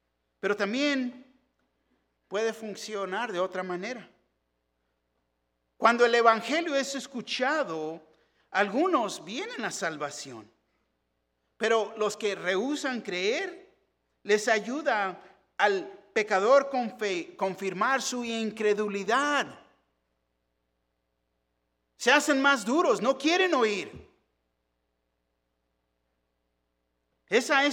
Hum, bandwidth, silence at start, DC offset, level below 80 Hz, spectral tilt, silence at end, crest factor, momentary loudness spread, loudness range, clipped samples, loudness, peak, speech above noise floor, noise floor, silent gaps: none; 17 kHz; 0.45 s; under 0.1%; -76 dBFS; -3 dB/octave; 0 s; 24 dB; 13 LU; 8 LU; under 0.1%; -27 LUFS; -6 dBFS; 51 dB; -78 dBFS; none